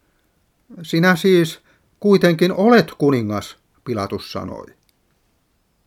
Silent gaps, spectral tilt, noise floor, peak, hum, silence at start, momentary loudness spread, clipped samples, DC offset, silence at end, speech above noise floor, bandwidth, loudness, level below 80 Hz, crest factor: none; -6.5 dB/octave; -64 dBFS; 0 dBFS; none; 0.7 s; 22 LU; under 0.1%; under 0.1%; 1.25 s; 48 dB; 16 kHz; -17 LUFS; -58 dBFS; 18 dB